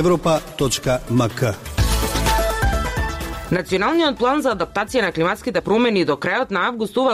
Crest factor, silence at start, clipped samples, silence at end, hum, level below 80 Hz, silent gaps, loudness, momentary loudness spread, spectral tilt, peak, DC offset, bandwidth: 12 dB; 0 s; under 0.1%; 0 s; none; -30 dBFS; none; -20 LUFS; 5 LU; -5 dB/octave; -6 dBFS; under 0.1%; 16 kHz